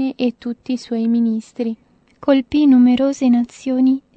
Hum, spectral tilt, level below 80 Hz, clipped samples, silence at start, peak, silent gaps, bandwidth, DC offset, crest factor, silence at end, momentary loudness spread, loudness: none; -6 dB/octave; -56 dBFS; under 0.1%; 0 s; -2 dBFS; none; 8.2 kHz; under 0.1%; 14 dB; 0.15 s; 13 LU; -17 LUFS